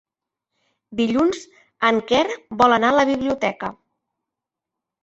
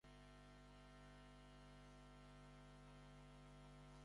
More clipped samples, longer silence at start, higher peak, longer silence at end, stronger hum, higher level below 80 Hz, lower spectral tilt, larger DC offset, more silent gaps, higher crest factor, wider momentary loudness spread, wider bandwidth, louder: neither; first, 0.9 s vs 0.05 s; first, -2 dBFS vs -52 dBFS; first, 1.3 s vs 0 s; second, none vs 50 Hz at -65 dBFS; first, -56 dBFS vs -68 dBFS; about the same, -4.5 dB/octave vs -5.5 dB/octave; neither; neither; first, 20 dB vs 12 dB; first, 15 LU vs 1 LU; second, 8.2 kHz vs 11 kHz; first, -19 LUFS vs -64 LUFS